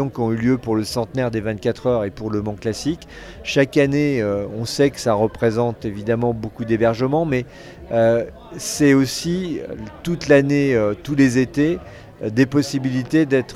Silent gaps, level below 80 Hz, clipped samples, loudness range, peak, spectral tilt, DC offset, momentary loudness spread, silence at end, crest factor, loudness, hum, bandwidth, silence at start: none; -46 dBFS; under 0.1%; 3 LU; -2 dBFS; -6 dB/octave; under 0.1%; 11 LU; 0 s; 18 dB; -20 LUFS; none; 14 kHz; 0 s